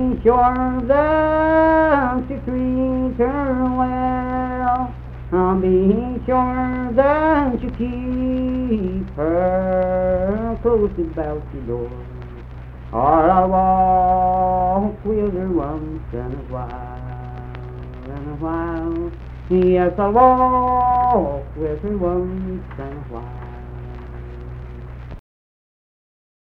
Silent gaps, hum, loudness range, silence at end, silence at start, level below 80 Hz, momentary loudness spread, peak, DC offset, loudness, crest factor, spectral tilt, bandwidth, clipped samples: none; none; 11 LU; 1.3 s; 0 s; -32 dBFS; 19 LU; 0 dBFS; under 0.1%; -19 LUFS; 18 dB; -10.5 dB/octave; 5.2 kHz; under 0.1%